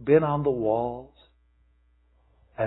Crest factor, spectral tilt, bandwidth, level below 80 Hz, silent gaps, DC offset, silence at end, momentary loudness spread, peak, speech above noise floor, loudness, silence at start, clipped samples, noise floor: 20 dB; -12 dB/octave; 4.1 kHz; -56 dBFS; none; under 0.1%; 0 s; 20 LU; -8 dBFS; 40 dB; -25 LUFS; 0 s; under 0.1%; -63 dBFS